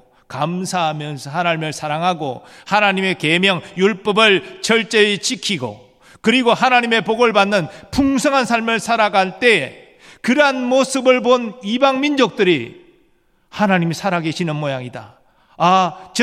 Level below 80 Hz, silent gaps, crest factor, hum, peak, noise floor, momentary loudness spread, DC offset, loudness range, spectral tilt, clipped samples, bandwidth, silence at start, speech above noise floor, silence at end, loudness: -52 dBFS; none; 18 dB; none; 0 dBFS; -58 dBFS; 11 LU; under 0.1%; 4 LU; -4 dB/octave; under 0.1%; 15 kHz; 0.3 s; 41 dB; 0 s; -16 LUFS